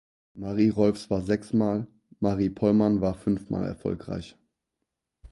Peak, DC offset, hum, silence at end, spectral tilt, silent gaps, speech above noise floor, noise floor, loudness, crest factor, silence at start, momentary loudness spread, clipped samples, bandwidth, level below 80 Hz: -8 dBFS; under 0.1%; none; 0.05 s; -8.5 dB/octave; none; 58 dB; -83 dBFS; -26 LUFS; 18 dB; 0.35 s; 14 LU; under 0.1%; 11.5 kHz; -50 dBFS